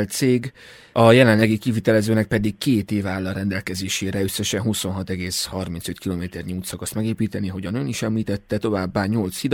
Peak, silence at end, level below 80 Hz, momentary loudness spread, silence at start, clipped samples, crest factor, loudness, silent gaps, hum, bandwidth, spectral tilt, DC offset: -2 dBFS; 0 s; -50 dBFS; 11 LU; 0 s; under 0.1%; 20 dB; -22 LUFS; none; none; 18 kHz; -5.5 dB/octave; under 0.1%